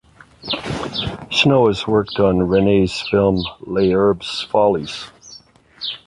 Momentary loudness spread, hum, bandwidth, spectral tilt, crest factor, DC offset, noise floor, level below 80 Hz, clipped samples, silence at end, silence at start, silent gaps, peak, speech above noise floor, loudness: 12 LU; none; 11 kHz; -6 dB/octave; 16 dB; under 0.1%; -45 dBFS; -42 dBFS; under 0.1%; 0.1 s; 0.45 s; none; -2 dBFS; 28 dB; -17 LUFS